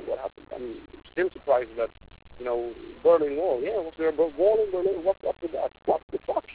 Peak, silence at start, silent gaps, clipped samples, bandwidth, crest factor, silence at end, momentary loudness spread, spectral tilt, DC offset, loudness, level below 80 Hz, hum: -10 dBFS; 0 s; 6.03-6.08 s; under 0.1%; 4 kHz; 16 dB; 0 s; 15 LU; -9 dB/octave; under 0.1%; -27 LUFS; -56 dBFS; none